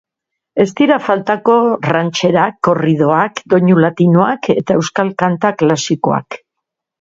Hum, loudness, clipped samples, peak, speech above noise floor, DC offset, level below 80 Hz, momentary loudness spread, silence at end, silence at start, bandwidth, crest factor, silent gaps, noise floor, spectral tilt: none; -13 LUFS; under 0.1%; 0 dBFS; 67 dB; under 0.1%; -54 dBFS; 5 LU; 0.65 s; 0.55 s; 7.8 kHz; 14 dB; none; -79 dBFS; -6 dB/octave